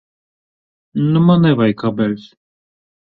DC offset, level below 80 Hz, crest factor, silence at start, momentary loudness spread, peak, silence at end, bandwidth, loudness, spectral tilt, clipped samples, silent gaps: under 0.1%; -54 dBFS; 16 dB; 0.95 s; 12 LU; -2 dBFS; 0.95 s; 4.7 kHz; -15 LUFS; -10 dB/octave; under 0.1%; none